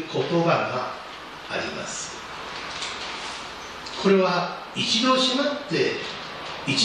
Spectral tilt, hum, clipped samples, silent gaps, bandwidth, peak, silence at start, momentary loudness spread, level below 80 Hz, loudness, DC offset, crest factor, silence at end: -4 dB/octave; none; under 0.1%; none; 12 kHz; -8 dBFS; 0 s; 14 LU; -58 dBFS; -25 LUFS; under 0.1%; 18 dB; 0 s